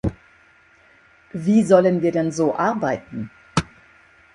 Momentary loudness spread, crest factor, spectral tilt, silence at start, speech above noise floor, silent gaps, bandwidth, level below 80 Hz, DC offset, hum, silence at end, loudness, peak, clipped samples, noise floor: 18 LU; 20 dB; -6.5 dB/octave; 0.05 s; 35 dB; none; 11 kHz; -46 dBFS; under 0.1%; none; 0.7 s; -20 LUFS; -2 dBFS; under 0.1%; -54 dBFS